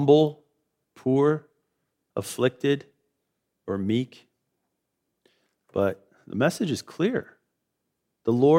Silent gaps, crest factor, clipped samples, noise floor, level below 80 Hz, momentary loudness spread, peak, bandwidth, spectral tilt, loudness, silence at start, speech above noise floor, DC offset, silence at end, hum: none; 20 dB; under 0.1%; -80 dBFS; -70 dBFS; 13 LU; -6 dBFS; 16 kHz; -6.5 dB/octave; -26 LUFS; 0 s; 57 dB; under 0.1%; 0 s; none